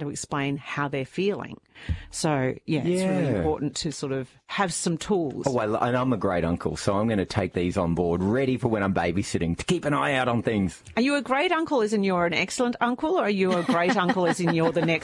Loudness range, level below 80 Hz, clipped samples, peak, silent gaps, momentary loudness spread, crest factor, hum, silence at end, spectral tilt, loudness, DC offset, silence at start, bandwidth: 4 LU; -50 dBFS; under 0.1%; -8 dBFS; none; 6 LU; 16 dB; none; 0 s; -5.5 dB/octave; -25 LUFS; under 0.1%; 0 s; 11.5 kHz